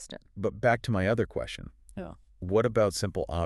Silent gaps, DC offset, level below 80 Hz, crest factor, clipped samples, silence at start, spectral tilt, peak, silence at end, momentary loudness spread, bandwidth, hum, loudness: none; under 0.1%; -48 dBFS; 18 dB; under 0.1%; 0 s; -6 dB/octave; -12 dBFS; 0 s; 17 LU; 13.5 kHz; none; -28 LUFS